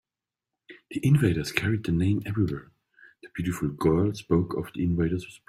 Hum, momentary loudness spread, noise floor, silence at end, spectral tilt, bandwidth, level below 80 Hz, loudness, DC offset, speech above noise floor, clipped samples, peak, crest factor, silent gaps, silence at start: none; 9 LU; under -90 dBFS; 0.1 s; -7 dB/octave; 15 kHz; -50 dBFS; -26 LUFS; under 0.1%; over 64 dB; under 0.1%; -4 dBFS; 22 dB; none; 0.7 s